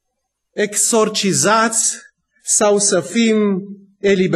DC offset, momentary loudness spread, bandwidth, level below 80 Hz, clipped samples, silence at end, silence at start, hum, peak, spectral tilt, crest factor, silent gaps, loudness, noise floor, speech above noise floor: under 0.1%; 14 LU; 13 kHz; -62 dBFS; under 0.1%; 0 s; 0.55 s; none; -2 dBFS; -3 dB/octave; 14 dB; none; -15 LUFS; -74 dBFS; 59 dB